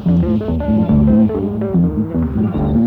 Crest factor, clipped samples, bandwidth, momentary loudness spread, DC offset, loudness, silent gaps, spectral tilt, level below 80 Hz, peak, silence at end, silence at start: 12 dB; under 0.1%; 4.1 kHz; 6 LU; under 0.1%; -15 LUFS; none; -11.5 dB/octave; -26 dBFS; -2 dBFS; 0 s; 0 s